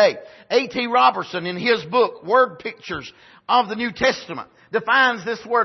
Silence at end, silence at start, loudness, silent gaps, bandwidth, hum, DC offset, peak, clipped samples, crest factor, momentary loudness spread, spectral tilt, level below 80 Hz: 0 s; 0 s; -20 LUFS; none; 6.2 kHz; none; under 0.1%; -2 dBFS; under 0.1%; 18 dB; 15 LU; -4 dB/octave; -60 dBFS